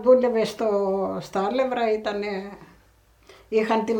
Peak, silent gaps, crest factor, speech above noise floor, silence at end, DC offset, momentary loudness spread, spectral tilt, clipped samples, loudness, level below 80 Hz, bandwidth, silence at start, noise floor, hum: -6 dBFS; none; 18 dB; 35 dB; 0 s; under 0.1%; 9 LU; -6 dB/octave; under 0.1%; -24 LUFS; -60 dBFS; 18 kHz; 0 s; -57 dBFS; none